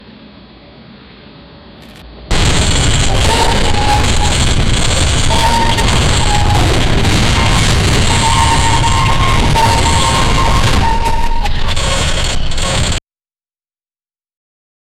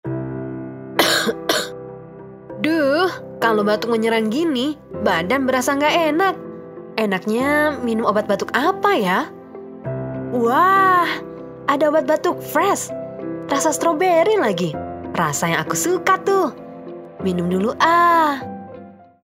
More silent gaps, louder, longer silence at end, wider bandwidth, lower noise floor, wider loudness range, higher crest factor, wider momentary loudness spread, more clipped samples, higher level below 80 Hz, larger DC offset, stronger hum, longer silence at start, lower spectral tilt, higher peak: neither; first, -12 LUFS vs -19 LUFS; first, 2 s vs 0.35 s; second, 14.5 kHz vs 16 kHz; first, under -90 dBFS vs -40 dBFS; first, 6 LU vs 2 LU; second, 10 dB vs 18 dB; second, 6 LU vs 16 LU; neither; first, -16 dBFS vs -56 dBFS; neither; neither; first, 0.2 s vs 0.05 s; about the same, -3.5 dB/octave vs -4 dB/octave; about the same, 0 dBFS vs 0 dBFS